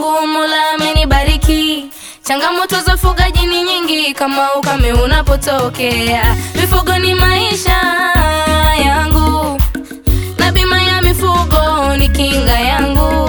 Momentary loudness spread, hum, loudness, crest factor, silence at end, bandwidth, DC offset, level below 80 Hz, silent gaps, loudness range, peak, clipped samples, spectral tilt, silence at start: 4 LU; none; -12 LUFS; 12 dB; 0 s; over 20 kHz; under 0.1%; -16 dBFS; none; 2 LU; 0 dBFS; under 0.1%; -4.5 dB/octave; 0 s